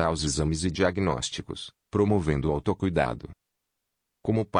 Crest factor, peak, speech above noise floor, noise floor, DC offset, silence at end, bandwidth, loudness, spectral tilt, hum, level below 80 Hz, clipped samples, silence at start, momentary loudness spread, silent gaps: 18 dB; -8 dBFS; 55 dB; -82 dBFS; under 0.1%; 0 s; 10.5 kHz; -27 LUFS; -5.5 dB/octave; none; -44 dBFS; under 0.1%; 0 s; 12 LU; none